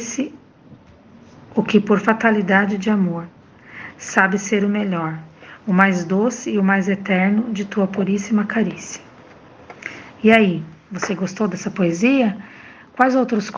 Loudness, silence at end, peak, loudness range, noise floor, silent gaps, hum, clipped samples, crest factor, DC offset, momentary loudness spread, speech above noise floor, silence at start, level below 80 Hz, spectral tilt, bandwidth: -18 LUFS; 0 s; 0 dBFS; 2 LU; -46 dBFS; none; none; under 0.1%; 20 dB; under 0.1%; 18 LU; 28 dB; 0 s; -60 dBFS; -6 dB/octave; 7.6 kHz